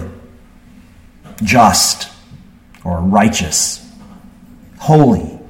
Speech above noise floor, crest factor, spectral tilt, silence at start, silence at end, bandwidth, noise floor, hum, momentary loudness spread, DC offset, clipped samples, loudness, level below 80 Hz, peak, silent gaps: 30 dB; 16 dB; -4 dB/octave; 0 s; 0.05 s; 16.5 kHz; -42 dBFS; none; 19 LU; under 0.1%; under 0.1%; -12 LUFS; -38 dBFS; 0 dBFS; none